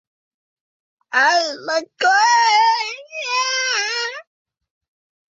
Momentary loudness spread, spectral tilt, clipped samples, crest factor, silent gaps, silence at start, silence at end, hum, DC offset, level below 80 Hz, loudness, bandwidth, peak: 12 LU; 2 dB/octave; under 0.1%; 18 dB; none; 1.1 s; 1.1 s; none; under 0.1%; -82 dBFS; -17 LUFS; 8 kHz; -2 dBFS